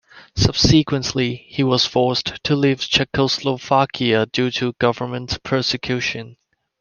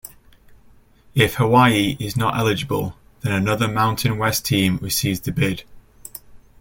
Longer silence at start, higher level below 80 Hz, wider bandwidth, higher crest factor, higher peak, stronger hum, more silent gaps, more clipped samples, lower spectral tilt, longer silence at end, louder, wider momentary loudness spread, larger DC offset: about the same, 0.15 s vs 0.05 s; first, -40 dBFS vs -46 dBFS; second, 10 kHz vs 17 kHz; about the same, 20 dB vs 20 dB; about the same, 0 dBFS vs -2 dBFS; neither; neither; neither; about the same, -5 dB/octave vs -5 dB/octave; first, 0.5 s vs 0.25 s; about the same, -19 LUFS vs -19 LUFS; second, 7 LU vs 17 LU; neither